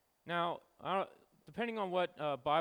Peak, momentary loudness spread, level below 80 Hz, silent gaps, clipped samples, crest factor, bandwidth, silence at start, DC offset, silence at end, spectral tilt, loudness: -20 dBFS; 8 LU; -76 dBFS; none; under 0.1%; 18 dB; over 20 kHz; 0.25 s; under 0.1%; 0 s; -6.5 dB/octave; -38 LUFS